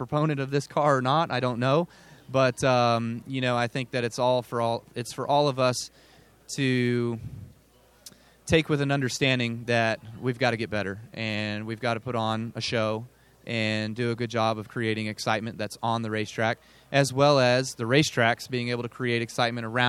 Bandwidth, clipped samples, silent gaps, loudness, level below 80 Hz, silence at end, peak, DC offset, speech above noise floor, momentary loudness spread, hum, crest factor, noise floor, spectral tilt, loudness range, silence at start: 15 kHz; under 0.1%; none; -26 LUFS; -58 dBFS; 0 s; -6 dBFS; under 0.1%; 33 dB; 10 LU; none; 20 dB; -59 dBFS; -5 dB/octave; 4 LU; 0 s